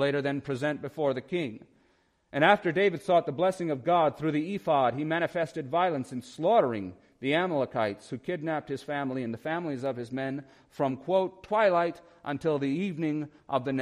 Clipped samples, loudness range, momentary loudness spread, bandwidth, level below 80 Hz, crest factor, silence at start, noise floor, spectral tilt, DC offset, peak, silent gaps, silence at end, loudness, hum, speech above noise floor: under 0.1%; 5 LU; 11 LU; 12.5 kHz; -70 dBFS; 22 dB; 0 s; -68 dBFS; -6.5 dB/octave; under 0.1%; -8 dBFS; none; 0 s; -29 LUFS; none; 40 dB